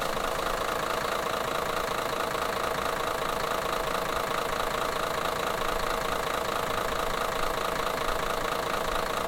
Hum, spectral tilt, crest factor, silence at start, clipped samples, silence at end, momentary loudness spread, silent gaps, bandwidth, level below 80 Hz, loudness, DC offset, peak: none; -3 dB/octave; 16 dB; 0 s; under 0.1%; 0 s; 0 LU; none; 17 kHz; -44 dBFS; -29 LUFS; under 0.1%; -14 dBFS